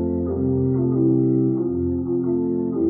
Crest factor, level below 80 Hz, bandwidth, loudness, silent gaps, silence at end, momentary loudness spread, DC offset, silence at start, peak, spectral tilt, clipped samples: 12 dB; -44 dBFS; 2.1 kHz; -21 LUFS; none; 0 s; 4 LU; under 0.1%; 0 s; -8 dBFS; -17.5 dB/octave; under 0.1%